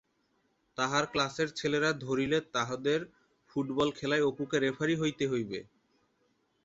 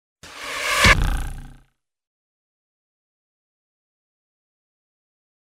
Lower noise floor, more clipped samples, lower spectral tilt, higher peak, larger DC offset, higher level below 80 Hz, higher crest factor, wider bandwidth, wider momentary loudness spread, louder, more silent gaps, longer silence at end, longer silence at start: first, -74 dBFS vs -60 dBFS; neither; first, -4.5 dB/octave vs -3 dB/octave; second, -14 dBFS vs -2 dBFS; neither; second, -66 dBFS vs -32 dBFS; second, 18 dB vs 24 dB; second, 8 kHz vs 16 kHz; second, 7 LU vs 20 LU; second, -31 LUFS vs -18 LUFS; neither; second, 1 s vs 4.05 s; first, 0.8 s vs 0.25 s